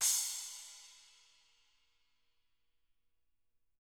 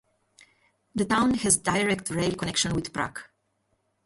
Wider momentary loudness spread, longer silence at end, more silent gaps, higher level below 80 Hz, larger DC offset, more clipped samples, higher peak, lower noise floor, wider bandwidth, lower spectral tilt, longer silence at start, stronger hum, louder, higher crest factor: first, 25 LU vs 11 LU; first, 2.85 s vs 0.8 s; neither; second, -86 dBFS vs -52 dBFS; neither; neither; second, -18 dBFS vs -6 dBFS; first, -85 dBFS vs -73 dBFS; first, over 20 kHz vs 12 kHz; second, 5 dB/octave vs -3.5 dB/octave; second, 0 s vs 0.95 s; first, 60 Hz at -100 dBFS vs none; second, -36 LUFS vs -25 LUFS; about the same, 26 dB vs 22 dB